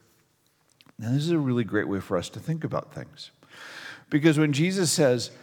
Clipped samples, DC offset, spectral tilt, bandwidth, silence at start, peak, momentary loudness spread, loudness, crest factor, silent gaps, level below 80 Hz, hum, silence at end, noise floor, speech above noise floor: under 0.1%; under 0.1%; -5 dB/octave; 18.5 kHz; 1 s; -6 dBFS; 21 LU; -25 LUFS; 20 dB; none; -68 dBFS; none; 0.05 s; -67 dBFS; 41 dB